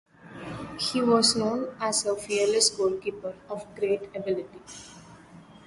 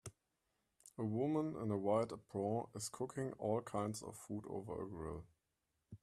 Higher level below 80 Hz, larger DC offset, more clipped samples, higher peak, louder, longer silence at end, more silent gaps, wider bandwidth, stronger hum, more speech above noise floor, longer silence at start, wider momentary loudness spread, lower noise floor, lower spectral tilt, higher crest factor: first, -62 dBFS vs -70 dBFS; neither; neither; first, -8 dBFS vs -24 dBFS; first, -26 LUFS vs -42 LUFS; about the same, 0.05 s vs 0.05 s; neither; second, 11.5 kHz vs 14 kHz; neither; second, 23 dB vs 46 dB; first, 0.25 s vs 0.05 s; first, 21 LU vs 11 LU; second, -50 dBFS vs -87 dBFS; second, -2.5 dB/octave vs -6.5 dB/octave; about the same, 20 dB vs 20 dB